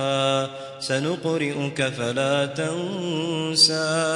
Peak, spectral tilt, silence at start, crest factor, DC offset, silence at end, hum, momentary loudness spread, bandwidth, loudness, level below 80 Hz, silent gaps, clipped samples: -4 dBFS; -3.5 dB/octave; 0 s; 20 dB; under 0.1%; 0 s; none; 10 LU; 11.5 kHz; -23 LUFS; -66 dBFS; none; under 0.1%